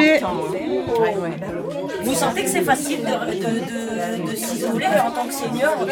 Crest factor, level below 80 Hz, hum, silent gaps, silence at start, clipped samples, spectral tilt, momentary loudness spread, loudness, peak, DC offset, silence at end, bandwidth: 18 dB; -54 dBFS; none; none; 0 s; under 0.1%; -4 dB/octave; 7 LU; -22 LUFS; -2 dBFS; under 0.1%; 0 s; 19 kHz